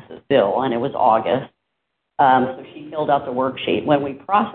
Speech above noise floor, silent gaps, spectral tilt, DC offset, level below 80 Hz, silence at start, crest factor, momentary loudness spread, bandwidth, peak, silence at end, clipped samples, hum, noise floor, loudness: 58 dB; none; -10.5 dB/octave; under 0.1%; -60 dBFS; 0.1 s; 18 dB; 11 LU; 4.4 kHz; -2 dBFS; 0 s; under 0.1%; none; -76 dBFS; -19 LUFS